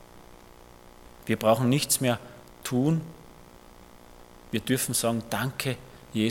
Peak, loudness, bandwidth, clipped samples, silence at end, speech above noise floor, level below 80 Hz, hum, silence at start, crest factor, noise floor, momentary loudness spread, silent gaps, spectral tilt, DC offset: -8 dBFS; -27 LUFS; 17.5 kHz; under 0.1%; 0 s; 25 dB; -56 dBFS; none; 0 s; 20 dB; -50 dBFS; 16 LU; none; -4.5 dB/octave; under 0.1%